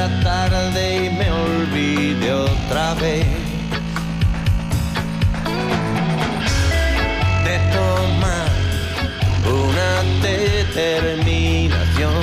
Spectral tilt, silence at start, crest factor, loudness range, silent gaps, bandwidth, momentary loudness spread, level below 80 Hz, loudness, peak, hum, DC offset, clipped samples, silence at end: -5.5 dB/octave; 0 s; 10 dB; 2 LU; none; 15 kHz; 4 LU; -26 dBFS; -19 LUFS; -8 dBFS; none; under 0.1%; under 0.1%; 0 s